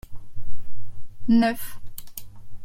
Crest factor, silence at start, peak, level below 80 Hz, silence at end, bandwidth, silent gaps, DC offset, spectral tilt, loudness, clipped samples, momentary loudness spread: 12 dB; 0.1 s; -8 dBFS; -42 dBFS; 0 s; 16.5 kHz; none; under 0.1%; -5.5 dB/octave; -23 LUFS; under 0.1%; 26 LU